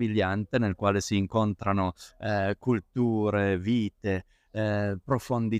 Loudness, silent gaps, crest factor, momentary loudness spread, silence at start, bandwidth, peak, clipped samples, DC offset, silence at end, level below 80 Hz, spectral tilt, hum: -28 LUFS; none; 16 dB; 6 LU; 0 s; 14.5 kHz; -12 dBFS; under 0.1%; under 0.1%; 0 s; -56 dBFS; -6.5 dB/octave; none